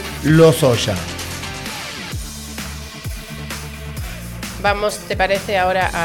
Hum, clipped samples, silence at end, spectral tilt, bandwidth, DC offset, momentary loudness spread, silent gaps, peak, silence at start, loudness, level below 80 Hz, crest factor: none; under 0.1%; 0 s; -5 dB/octave; 18.5 kHz; under 0.1%; 17 LU; none; -2 dBFS; 0 s; -19 LUFS; -34 dBFS; 16 dB